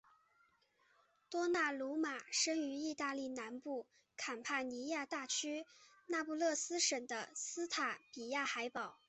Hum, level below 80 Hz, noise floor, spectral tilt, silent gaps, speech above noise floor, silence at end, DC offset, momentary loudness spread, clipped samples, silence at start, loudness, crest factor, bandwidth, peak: none; -86 dBFS; -75 dBFS; -0.5 dB/octave; none; 35 dB; 0.15 s; under 0.1%; 10 LU; under 0.1%; 1.3 s; -40 LUFS; 20 dB; 8.2 kHz; -22 dBFS